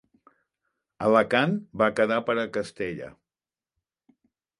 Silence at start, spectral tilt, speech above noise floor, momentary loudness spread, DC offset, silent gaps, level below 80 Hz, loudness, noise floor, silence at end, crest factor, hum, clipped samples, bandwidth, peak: 1 s; -6 dB/octave; over 66 dB; 12 LU; under 0.1%; none; -64 dBFS; -25 LUFS; under -90 dBFS; 1.5 s; 22 dB; none; under 0.1%; 11.5 kHz; -6 dBFS